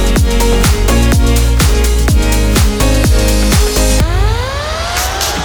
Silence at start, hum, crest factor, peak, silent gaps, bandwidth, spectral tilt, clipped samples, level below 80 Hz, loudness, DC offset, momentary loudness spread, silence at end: 0 s; none; 10 dB; 0 dBFS; none; over 20 kHz; -4.5 dB/octave; under 0.1%; -12 dBFS; -12 LUFS; 1%; 4 LU; 0 s